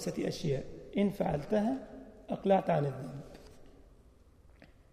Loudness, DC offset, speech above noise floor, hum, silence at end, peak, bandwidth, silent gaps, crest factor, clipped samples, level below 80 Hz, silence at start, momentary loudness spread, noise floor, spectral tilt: -33 LUFS; under 0.1%; 28 dB; none; 0.25 s; -16 dBFS; 15 kHz; none; 18 dB; under 0.1%; -56 dBFS; 0 s; 20 LU; -60 dBFS; -7 dB/octave